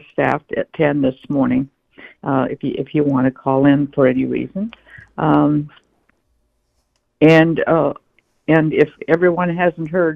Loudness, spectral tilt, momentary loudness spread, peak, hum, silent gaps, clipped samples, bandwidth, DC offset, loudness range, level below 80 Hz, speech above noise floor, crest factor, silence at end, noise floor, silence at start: -17 LUFS; -9 dB/octave; 12 LU; 0 dBFS; none; none; under 0.1%; 6.8 kHz; under 0.1%; 4 LU; -50 dBFS; 50 dB; 16 dB; 0 s; -66 dBFS; 0.2 s